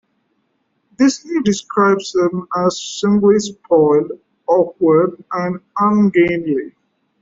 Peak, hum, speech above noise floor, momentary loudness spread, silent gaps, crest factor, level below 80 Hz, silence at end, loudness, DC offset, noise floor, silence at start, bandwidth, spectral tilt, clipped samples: -2 dBFS; none; 51 dB; 9 LU; none; 14 dB; -56 dBFS; 0.5 s; -16 LUFS; under 0.1%; -66 dBFS; 1 s; 7.8 kHz; -6 dB/octave; under 0.1%